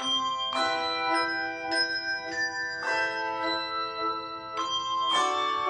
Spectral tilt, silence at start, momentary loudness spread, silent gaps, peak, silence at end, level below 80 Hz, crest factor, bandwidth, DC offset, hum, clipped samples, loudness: -1 dB/octave; 0 s; 6 LU; none; -14 dBFS; 0 s; -68 dBFS; 14 dB; 10.5 kHz; under 0.1%; none; under 0.1%; -28 LUFS